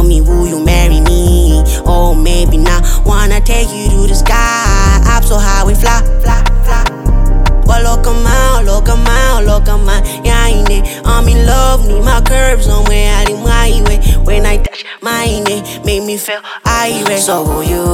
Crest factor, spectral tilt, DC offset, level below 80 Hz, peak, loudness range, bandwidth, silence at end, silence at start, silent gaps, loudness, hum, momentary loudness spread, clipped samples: 8 dB; -4.5 dB/octave; under 0.1%; -8 dBFS; 0 dBFS; 3 LU; 15.5 kHz; 0 s; 0 s; none; -12 LUFS; none; 5 LU; under 0.1%